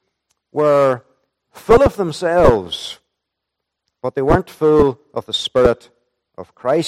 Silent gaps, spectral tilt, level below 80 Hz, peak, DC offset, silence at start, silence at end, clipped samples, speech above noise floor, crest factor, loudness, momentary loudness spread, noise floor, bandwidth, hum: none; -6 dB/octave; -34 dBFS; 0 dBFS; under 0.1%; 0.55 s; 0 s; under 0.1%; 64 dB; 16 dB; -16 LUFS; 15 LU; -79 dBFS; 14 kHz; none